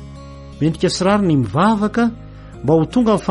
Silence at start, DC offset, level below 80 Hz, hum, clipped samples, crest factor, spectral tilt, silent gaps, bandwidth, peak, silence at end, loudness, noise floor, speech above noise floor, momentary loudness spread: 0 s; under 0.1%; -40 dBFS; none; under 0.1%; 14 dB; -6.5 dB/octave; none; 11.5 kHz; -4 dBFS; 0 s; -17 LUFS; -35 dBFS; 19 dB; 21 LU